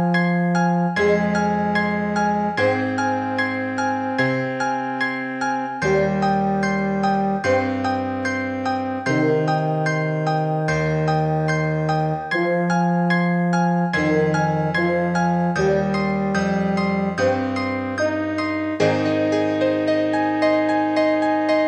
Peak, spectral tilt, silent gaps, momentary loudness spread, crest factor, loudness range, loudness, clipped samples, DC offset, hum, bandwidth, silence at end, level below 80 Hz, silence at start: -6 dBFS; -7 dB/octave; none; 4 LU; 14 dB; 2 LU; -20 LUFS; under 0.1%; under 0.1%; none; 9.4 kHz; 0 s; -48 dBFS; 0 s